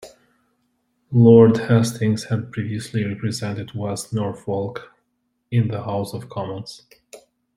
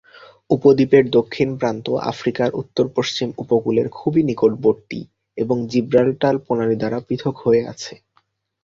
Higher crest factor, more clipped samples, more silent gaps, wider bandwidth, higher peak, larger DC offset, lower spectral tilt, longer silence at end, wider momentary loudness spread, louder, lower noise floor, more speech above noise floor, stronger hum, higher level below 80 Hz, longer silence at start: about the same, 20 dB vs 18 dB; neither; neither; first, 14.5 kHz vs 7.6 kHz; about the same, -2 dBFS vs -2 dBFS; neither; about the same, -7 dB/octave vs -6.5 dB/octave; second, 0.4 s vs 0.7 s; first, 17 LU vs 11 LU; about the same, -20 LUFS vs -19 LUFS; first, -72 dBFS vs -64 dBFS; first, 52 dB vs 45 dB; neither; about the same, -56 dBFS vs -56 dBFS; second, 0 s vs 0.5 s